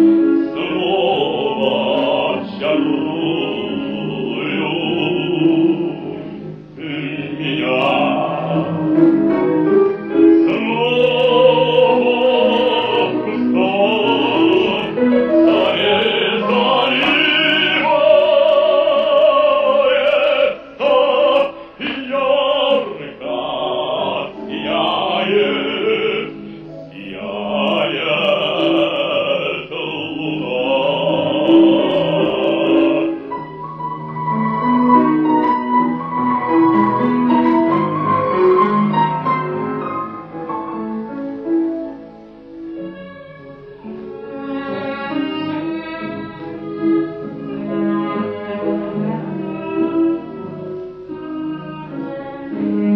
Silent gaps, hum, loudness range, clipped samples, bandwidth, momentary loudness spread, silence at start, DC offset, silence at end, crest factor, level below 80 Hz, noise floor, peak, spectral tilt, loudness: none; none; 10 LU; under 0.1%; 5.8 kHz; 15 LU; 0 s; under 0.1%; 0 s; 16 dB; -56 dBFS; -37 dBFS; 0 dBFS; -7.5 dB/octave; -16 LUFS